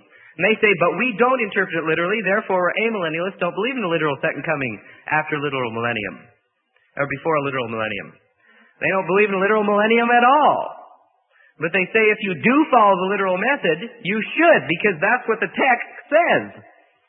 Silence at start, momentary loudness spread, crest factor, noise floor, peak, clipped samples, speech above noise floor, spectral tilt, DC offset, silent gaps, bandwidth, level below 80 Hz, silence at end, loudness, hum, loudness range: 0.4 s; 9 LU; 18 dB; -65 dBFS; -2 dBFS; under 0.1%; 46 dB; -10.5 dB/octave; under 0.1%; none; 4 kHz; -66 dBFS; 0.5 s; -19 LUFS; none; 7 LU